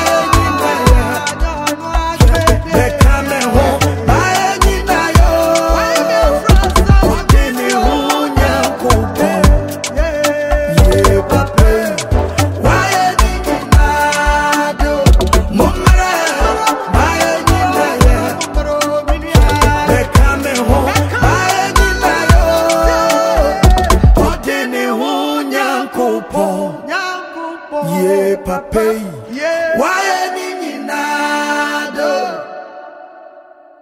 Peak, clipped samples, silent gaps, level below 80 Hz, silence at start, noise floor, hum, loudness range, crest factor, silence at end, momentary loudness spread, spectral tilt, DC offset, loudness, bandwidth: 0 dBFS; 0.1%; none; -16 dBFS; 0 s; -40 dBFS; none; 5 LU; 12 dB; 0.4 s; 7 LU; -5 dB/octave; under 0.1%; -13 LUFS; 16.5 kHz